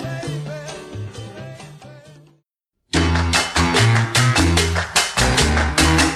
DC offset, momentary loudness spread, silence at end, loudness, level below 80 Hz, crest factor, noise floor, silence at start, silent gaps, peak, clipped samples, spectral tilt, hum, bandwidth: under 0.1%; 18 LU; 0 s; -17 LUFS; -28 dBFS; 18 dB; -73 dBFS; 0 s; none; -2 dBFS; under 0.1%; -3.5 dB/octave; none; 13.5 kHz